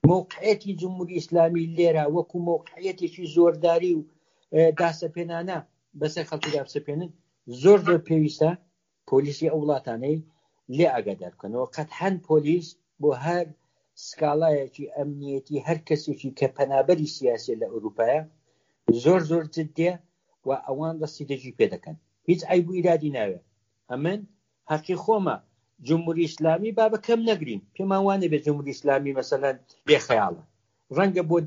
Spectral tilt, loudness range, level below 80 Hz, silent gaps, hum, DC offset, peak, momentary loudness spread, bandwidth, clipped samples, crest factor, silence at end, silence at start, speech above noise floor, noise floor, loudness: -6 dB/octave; 4 LU; -64 dBFS; none; none; under 0.1%; -4 dBFS; 12 LU; 7.4 kHz; under 0.1%; 20 dB; 0 s; 0.05 s; 46 dB; -70 dBFS; -25 LUFS